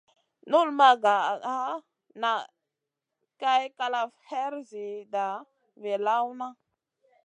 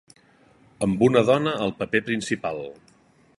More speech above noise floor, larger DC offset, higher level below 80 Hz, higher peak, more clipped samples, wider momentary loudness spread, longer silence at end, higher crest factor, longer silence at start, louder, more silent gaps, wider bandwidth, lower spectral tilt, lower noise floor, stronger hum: first, 60 dB vs 36 dB; neither; second, under -90 dBFS vs -58 dBFS; about the same, -6 dBFS vs -4 dBFS; neither; first, 19 LU vs 12 LU; about the same, 0.75 s vs 0.65 s; about the same, 22 dB vs 20 dB; second, 0.45 s vs 0.8 s; second, -27 LUFS vs -23 LUFS; neither; second, 9.2 kHz vs 11.5 kHz; second, -3 dB/octave vs -5.5 dB/octave; first, -86 dBFS vs -58 dBFS; neither